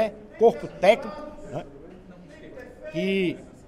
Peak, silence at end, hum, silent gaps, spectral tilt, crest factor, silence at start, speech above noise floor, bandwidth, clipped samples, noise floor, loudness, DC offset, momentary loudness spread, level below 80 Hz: -4 dBFS; 0.2 s; none; none; -6 dB/octave; 22 dB; 0 s; 23 dB; 13 kHz; under 0.1%; -46 dBFS; -24 LUFS; under 0.1%; 23 LU; -52 dBFS